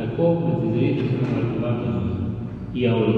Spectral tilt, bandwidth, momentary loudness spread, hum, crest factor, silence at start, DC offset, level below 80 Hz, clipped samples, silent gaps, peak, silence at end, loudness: -10 dB/octave; 4.9 kHz; 7 LU; none; 14 dB; 0 s; under 0.1%; -46 dBFS; under 0.1%; none; -8 dBFS; 0 s; -23 LUFS